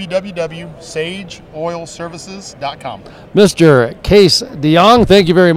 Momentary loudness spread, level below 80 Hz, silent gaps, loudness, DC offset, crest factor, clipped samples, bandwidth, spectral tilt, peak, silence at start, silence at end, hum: 20 LU; -36 dBFS; none; -11 LUFS; under 0.1%; 12 dB; 0.3%; 15.5 kHz; -5.5 dB/octave; 0 dBFS; 0 s; 0 s; none